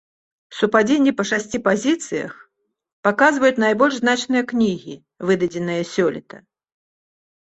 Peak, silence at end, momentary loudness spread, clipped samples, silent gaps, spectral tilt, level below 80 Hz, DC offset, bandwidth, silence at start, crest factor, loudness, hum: -2 dBFS; 1.15 s; 12 LU; under 0.1%; 2.93-3.03 s; -4.5 dB/octave; -60 dBFS; under 0.1%; 8.4 kHz; 0.5 s; 18 dB; -19 LUFS; none